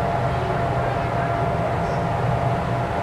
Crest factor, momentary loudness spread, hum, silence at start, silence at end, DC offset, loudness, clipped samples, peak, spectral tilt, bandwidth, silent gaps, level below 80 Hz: 12 dB; 1 LU; none; 0 s; 0 s; 0.2%; -23 LUFS; under 0.1%; -10 dBFS; -7.5 dB/octave; 12 kHz; none; -36 dBFS